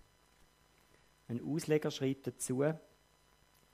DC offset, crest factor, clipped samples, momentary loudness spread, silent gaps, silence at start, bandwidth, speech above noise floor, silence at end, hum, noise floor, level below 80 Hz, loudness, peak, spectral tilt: under 0.1%; 20 dB; under 0.1%; 10 LU; none; 1.3 s; 15.5 kHz; 33 dB; 0.9 s; none; -69 dBFS; -74 dBFS; -37 LUFS; -18 dBFS; -5.5 dB/octave